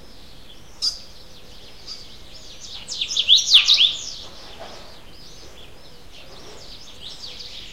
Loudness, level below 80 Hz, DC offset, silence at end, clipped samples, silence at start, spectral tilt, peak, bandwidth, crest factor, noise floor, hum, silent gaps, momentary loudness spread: -15 LUFS; -50 dBFS; 1%; 0 s; under 0.1%; 0.8 s; 1 dB/octave; 0 dBFS; 16 kHz; 24 dB; -45 dBFS; none; none; 29 LU